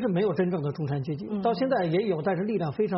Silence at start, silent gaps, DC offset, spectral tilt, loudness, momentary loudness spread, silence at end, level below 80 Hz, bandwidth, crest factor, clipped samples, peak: 0 s; none; under 0.1%; -7 dB/octave; -27 LUFS; 5 LU; 0 s; -64 dBFS; 5.8 kHz; 12 dB; under 0.1%; -14 dBFS